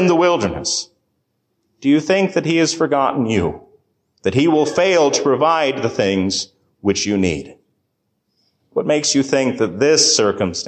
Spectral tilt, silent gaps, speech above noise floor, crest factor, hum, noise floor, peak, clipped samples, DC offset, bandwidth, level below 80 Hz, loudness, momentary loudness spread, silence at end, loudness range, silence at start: -4 dB/octave; none; 54 dB; 14 dB; none; -70 dBFS; -2 dBFS; under 0.1%; under 0.1%; 9.6 kHz; -46 dBFS; -17 LUFS; 9 LU; 0 s; 4 LU; 0 s